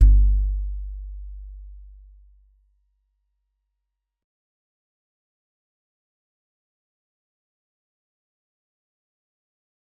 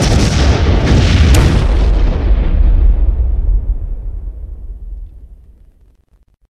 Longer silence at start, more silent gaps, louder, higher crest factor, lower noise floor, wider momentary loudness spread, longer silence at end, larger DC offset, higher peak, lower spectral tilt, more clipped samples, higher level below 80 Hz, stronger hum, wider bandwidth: about the same, 0 s vs 0 s; neither; second, -24 LUFS vs -13 LUFS; first, 24 dB vs 12 dB; first, -82 dBFS vs -51 dBFS; first, 25 LU vs 21 LU; first, 8.25 s vs 1.15 s; neither; second, -4 dBFS vs 0 dBFS; first, -11.5 dB/octave vs -6 dB/octave; neither; second, -26 dBFS vs -12 dBFS; neither; second, 0.3 kHz vs 12.5 kHz